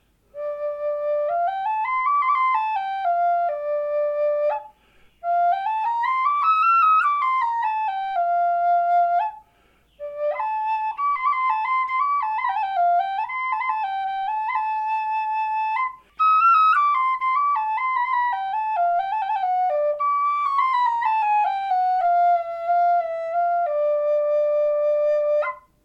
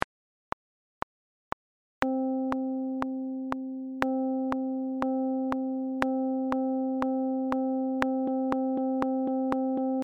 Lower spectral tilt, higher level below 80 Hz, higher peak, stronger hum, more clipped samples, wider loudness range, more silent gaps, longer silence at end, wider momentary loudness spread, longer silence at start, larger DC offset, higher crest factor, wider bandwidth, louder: second, -2 dB/octave vs -7 dB/octave; second, -66 dBFS vs -60 dBFS; second, -10 dBFS vs -4 dBFS; neither; neither; about the same, 4 LU vs 5 LU; neither; first, 0.25 s vs 0 s; second, 7 LU vs 13 LU; second, 0.35 s vs 2 s; neither; second, 12 dB vs 26 dB; about the same, 6.6 kHz vs 6.6 kHz; first, -21 LUFS vs -30 LUFS